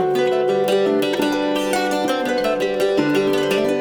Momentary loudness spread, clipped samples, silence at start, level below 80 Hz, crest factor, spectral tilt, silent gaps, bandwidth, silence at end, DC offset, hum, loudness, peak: 2 LU; under 0.1%; 0 s; -54 dBFS; 12 dB; -4.5 dB/octave; none; 19 kHz; 0 s; under 0.1%; none; -19 LUFS; -6 dBFS